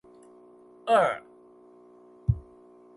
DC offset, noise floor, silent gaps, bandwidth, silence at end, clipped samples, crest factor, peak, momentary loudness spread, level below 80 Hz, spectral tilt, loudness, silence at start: under 0.1%; -54 dBFS; none; 11.5 kHz; 0.55 s; under 0.1%; 20 dB; -10 dBFS; 15 LU; -44 dBFS; -6.5 dB/octave; -27 LUFS; 0.85 s